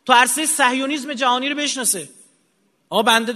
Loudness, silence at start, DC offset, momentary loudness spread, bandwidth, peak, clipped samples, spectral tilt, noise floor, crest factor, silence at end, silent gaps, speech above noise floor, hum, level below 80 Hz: -18 LUFS; 0.05 s; under 0.1%; 9 LU; 13.5 kHz; 0 dBFS; under 0.1%; -1 dB/octave; -64 dBFS; 20 dB; 0 s; none; 46 dB; none; -72 dBFS